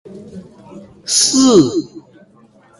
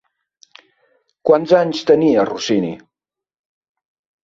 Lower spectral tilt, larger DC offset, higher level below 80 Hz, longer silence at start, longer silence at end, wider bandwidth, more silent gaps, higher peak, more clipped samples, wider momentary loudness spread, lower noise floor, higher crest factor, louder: second, -3.5 dB/octave vs -5.5 dB/octave; neither; first, -54 dBFS vs -60 dBFS; second, 0.1 s vs 1.25 s; second, 0.8 s vs 1.45 s; first, 11.5 kHz vs 7.6 kHz; neither; about the same, 0 dBFS vs -2 dBFS; neither; first, 25 LU vs 11 LU; second, -48 dBFS vs -88 dBFS; about the same, 16 dB vs 18 dB; first, -12 LUFS vs -16 LUFS